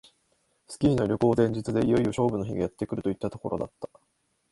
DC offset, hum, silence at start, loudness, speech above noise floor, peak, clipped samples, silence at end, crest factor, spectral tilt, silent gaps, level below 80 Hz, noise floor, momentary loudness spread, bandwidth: under 0.1%; none; 0.7 s; -27 LUFS; 45 dB; -10 dBFS; under 0.1%; 0.65 s; 18 dB; -7.5 dB/octave; none; -52 dBFS; -71 dBFS; 12 LU; 11.5 kHz